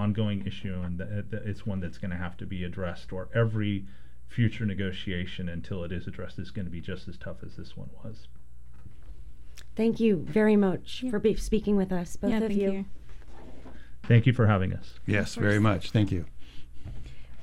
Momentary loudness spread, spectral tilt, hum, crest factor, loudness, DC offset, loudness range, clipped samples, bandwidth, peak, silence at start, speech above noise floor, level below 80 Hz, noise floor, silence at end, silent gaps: 21 LU; -7.5 dB/octave; none; 18 dB; -29 LUFS; 2%; 12 LU; under 0.1%; 12 kHz; -10 dBFS; 0 s; 21 dB; -46 dBFS; -49 dBFS; 0 s; none